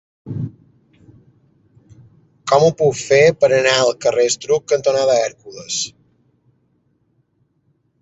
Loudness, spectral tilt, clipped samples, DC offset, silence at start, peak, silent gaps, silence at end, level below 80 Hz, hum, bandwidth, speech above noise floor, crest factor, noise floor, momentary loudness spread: -16 LUFS; -3.5 dB/octave; under 0.1%; under 0.1%; 0.25 s; 0 dBFS; none; 2.1 s; -58 dBFS; none; 8.2 kHz; 48 dB; 18 dB; -63 dBFS; 15 LU